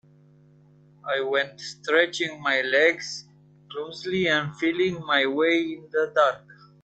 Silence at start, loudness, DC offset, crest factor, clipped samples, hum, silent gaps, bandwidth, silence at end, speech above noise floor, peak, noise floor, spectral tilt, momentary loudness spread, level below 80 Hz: 1.05 s; -24 LUFS; under 0.1%; 20 dB; under 0.1%; 50 Hz at -50 dBFS; none; 8.8 kHz; 0.3 s; 31 dB; -4 dBFS; -55 dBFS; -4 dB/octave; 14 LU; -70 dBFS